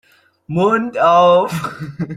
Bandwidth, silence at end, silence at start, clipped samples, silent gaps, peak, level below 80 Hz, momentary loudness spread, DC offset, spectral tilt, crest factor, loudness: 15 kHz; 0 s; 0.5 s; under 0.1%; none; -2 dBFS; -56 dBFS; 14 LU; under 0.1%; -6.5 dB/octave; 14 dB; -14 LUFS